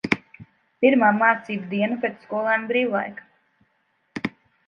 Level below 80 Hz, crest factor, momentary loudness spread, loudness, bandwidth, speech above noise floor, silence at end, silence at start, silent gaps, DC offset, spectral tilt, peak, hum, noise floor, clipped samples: -64 dBFS; 22 dB; 15 LU; -22 LUFS; 7.6 kHz; 48 dB; 0.4 s; 0.05 s; none; under 0.1%; -6.5 dB/octave; -2 dBFS; none; -69 dBFS; under 0.1%